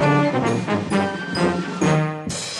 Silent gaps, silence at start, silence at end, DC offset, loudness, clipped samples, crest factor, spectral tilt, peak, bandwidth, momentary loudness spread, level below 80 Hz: none; 0 s; 0 s; under 0.1%; -21 LUFS; under 0.1%; 14 dB; -5.5 dB/octave; -6 dBFS; 11.5 kHz; 5 LU; -52 dBFS